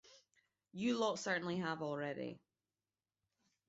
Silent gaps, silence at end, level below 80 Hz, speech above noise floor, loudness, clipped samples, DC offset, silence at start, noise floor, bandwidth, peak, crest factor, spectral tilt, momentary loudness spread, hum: none; 1.3 s; -82 dBFS; over 50 dB; -40 LUFS; under 0.1%; under 0.1%; 0.05 s; under -90 dBFS; 7.6 kHz; -24 dBFS; 20 dB; -4 dB/octave; 13 LU; none